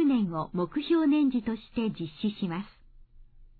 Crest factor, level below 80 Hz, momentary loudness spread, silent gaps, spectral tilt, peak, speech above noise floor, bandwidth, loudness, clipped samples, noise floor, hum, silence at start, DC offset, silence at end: 14 dB; -56 dBFS; 10 LU; none; -10.5 dB/octave; -16 dBFS; 24 dB; 4.7 kHz; -29 LUFS; under 0.1%; -52 dBFS; none; 0 s; under 0.1%; 0.15 s